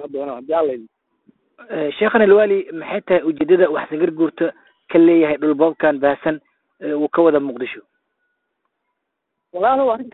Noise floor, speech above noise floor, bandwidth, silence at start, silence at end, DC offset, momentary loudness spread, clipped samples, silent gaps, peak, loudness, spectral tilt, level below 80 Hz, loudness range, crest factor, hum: -77 dBFS; 60 dB; 4.1 kHz; 0 s; 0.05 s; under 0.1%; 15 LU; under 0.1%; none; 0 dBFS; -17 LUFS; -11 dB/octave; -60 dBFS; 5 LU; 18 dB; none